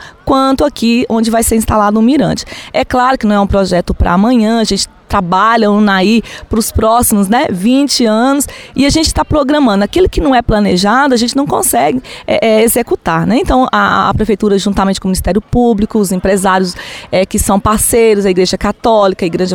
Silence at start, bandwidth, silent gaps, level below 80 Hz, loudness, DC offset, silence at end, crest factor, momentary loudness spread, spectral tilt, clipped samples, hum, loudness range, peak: 0 s; 18.5 kHz; none; -26 dBFS; -11 LUFS; 0.2%; 0 s; 10 dB; 5 LU; -4.5 dB/octave; under 0.1%; none; 1 LU; 0 dBFS